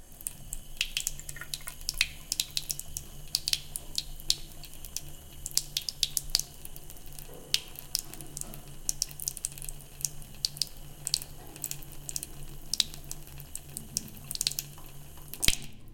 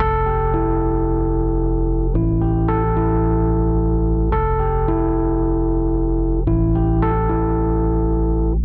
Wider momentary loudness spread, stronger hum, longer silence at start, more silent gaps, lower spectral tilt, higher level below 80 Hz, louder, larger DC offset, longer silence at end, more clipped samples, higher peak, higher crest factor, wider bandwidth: first, 15 LU vs 2 LU; neither; about the same, 0 s vs 0 s; neither; second, -0.5 dB/octave vs -13.5 dB/octave; second, -46 dBFS vs -20 dBFS; second, -33 LUFS vs -19 LUFS; neither; about the same, 0 s vs 0 s; neither; about the same, -4 dBFS vs -6 dBFS; first, 32 dB vs 10 dB; first, 17 kHz vs 3.3 kHz